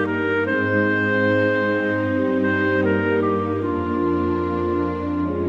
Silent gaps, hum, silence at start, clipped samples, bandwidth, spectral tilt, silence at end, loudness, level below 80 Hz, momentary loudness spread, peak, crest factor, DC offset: none; none; 0 s; under 0.1%; 7.2 kHz; -8.5 dB/octave; 0 s; -20 LUFS; -46 dBFS; 4 LU; -8 dBFS; 12 dB; under 0.1%